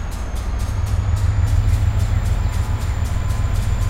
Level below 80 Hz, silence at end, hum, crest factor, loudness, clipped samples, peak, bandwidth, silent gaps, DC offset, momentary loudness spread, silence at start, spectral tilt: -20 dBFS; 0 s; none; 12 dB; -21 LUFS; under 0.1%; -6 dBFS; 15.5 kHz; none; under 0.1%; 6 LU; 0 s; -6 dB/octave